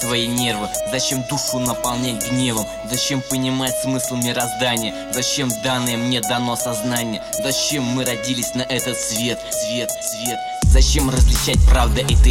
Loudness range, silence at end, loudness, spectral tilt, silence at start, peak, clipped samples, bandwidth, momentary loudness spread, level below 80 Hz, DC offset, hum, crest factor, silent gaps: 3 LU; 0 s; -19 LUFS; -3.5 dB/octave; 0 s; 0 dBFS; under 0.1%; 16.5 kHz; 7 LU; -22 dBFS; under 0.1%; none; 18 dB; none